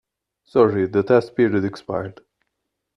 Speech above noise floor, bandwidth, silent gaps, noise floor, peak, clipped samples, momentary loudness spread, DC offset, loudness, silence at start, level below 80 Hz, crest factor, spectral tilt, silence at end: 59 dB; 10 kHz; none; -78 dBFS; -2 dBFS; under 0.1%; 11 LU; under 0.1%; -20 LUFS; 0.55 s; -60 dBFS; 18 dB; -8.5 dB/octave; 0.85 s